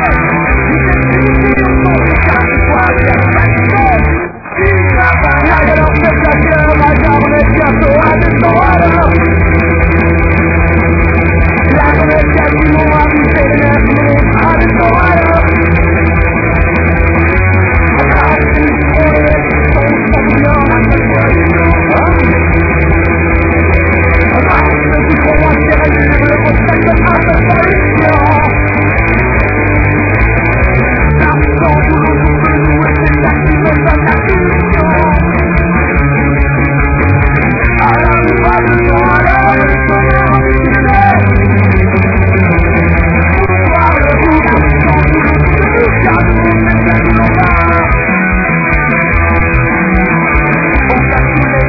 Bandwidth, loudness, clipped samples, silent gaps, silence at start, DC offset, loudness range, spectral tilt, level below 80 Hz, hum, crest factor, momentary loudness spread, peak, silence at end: 5.4 kHz; -8 LUFS; 0.8%; none; 0 s; under 0.1%; 1 LU; -10.5 dB/octave; -14 dBFS; none; 8 dB; 2 LU; 0 dBFS; 0 s